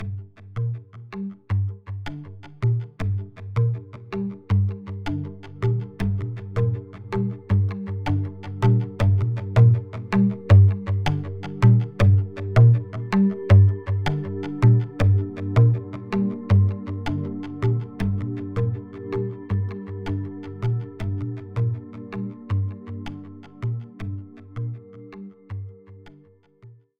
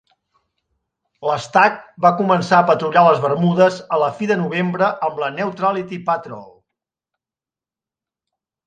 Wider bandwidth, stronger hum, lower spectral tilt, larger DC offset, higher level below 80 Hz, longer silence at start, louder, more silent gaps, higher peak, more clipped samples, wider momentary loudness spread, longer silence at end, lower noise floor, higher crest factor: second, 6.2 kHz vs 9.2 kHz; neither; first, -9 dB/octave vs -6.5 dB/octave; neither; first, -44 dBFS vs -66 dBFS; second, 0 s vs 1.2 s; second, -23 LUFS vs -17 LUFS; neither; second, -4 dBFS vs 0 dBFS; neither; first, 18 LU vs 9 LU; second, 0.25 s vs 2.2 s; second, -54 dBFS vs under -90 dBFS; about the same, 18 dB vs 18 dB